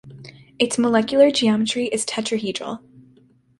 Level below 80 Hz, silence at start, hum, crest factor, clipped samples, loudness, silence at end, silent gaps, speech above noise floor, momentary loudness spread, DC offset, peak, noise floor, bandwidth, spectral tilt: -60 dBFS; 0.05 s; none; 18 dB; under 0.1%; -20 LUFS; 0.8 s; none; 36 dB; 13 LU; under 0.1%; -4 dBFS; -55 dBFS; 11.5 kHz; -3.5 dB/octave